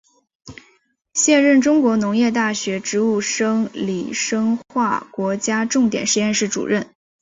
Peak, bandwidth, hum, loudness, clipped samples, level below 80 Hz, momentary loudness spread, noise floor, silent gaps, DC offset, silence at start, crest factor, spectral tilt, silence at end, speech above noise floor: -4 dBFS; 7.8 kHz; none; -18 LUFS; under 0.1%; -60 dBFS; 9 LU; -60 dBFS; none; under 0.1%; 0.45 s; 16 dB; -3.5 dB/octave; 0.35 s; 42 dB